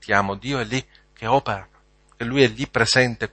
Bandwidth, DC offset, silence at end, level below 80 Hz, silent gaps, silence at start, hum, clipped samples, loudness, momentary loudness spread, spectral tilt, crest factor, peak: 8.8 kHz; under 0.1%; 0.05 s; -48 dBFS; none; 0 s; none; under 0.1%; -21 LUFS; 13 LU; -4.5 dB/octave; 22 dB; 0 dBFS